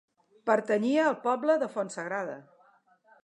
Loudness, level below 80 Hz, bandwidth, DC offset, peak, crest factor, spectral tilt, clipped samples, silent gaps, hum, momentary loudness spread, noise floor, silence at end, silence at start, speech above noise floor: -28 LUFS; -84 dBFS; 10.5 kHz; under 0.1%; -10 dBFS; 20 dB; -5 dB/octave; under 0.1%; none; none; 10 LU; -64 dBFS; 0.8 s; 0.45 s; 36 dB